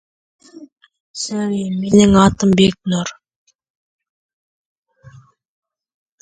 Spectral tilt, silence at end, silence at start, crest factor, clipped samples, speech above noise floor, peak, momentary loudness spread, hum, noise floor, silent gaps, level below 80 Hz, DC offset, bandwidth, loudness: -5.5 dB/octave; 3.1 s; 0.55 s; 18 dB; under 0.1%; 31 dB; 0 dBFS; 15 LU; none; -45 dBFS; 0.72-0.76 s, 1.00-1.14 s; -42 dBFS; under 0.1%; 9.2 kHz; -15 LUFS